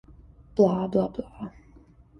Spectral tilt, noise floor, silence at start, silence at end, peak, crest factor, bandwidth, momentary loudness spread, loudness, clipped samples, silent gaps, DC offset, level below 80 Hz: -9 dB/octave; -54 dBFS; 0.55 s; 0.7 s; -8 dBFS; 20 dB; 6.2 kHz; 19 LU; -25 LUFS; under 0.1%; none; under 0.1%; -54 dBFS